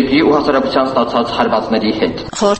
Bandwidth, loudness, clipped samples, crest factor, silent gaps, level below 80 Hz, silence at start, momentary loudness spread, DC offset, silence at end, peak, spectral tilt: 8.8 kHz; -14 LUFS; under 0.1%; 14 dB; none; -42 dBFS; 0 s; 5 LU; under 0.1%; 0 s; 0 dBFS; -5 dB/octave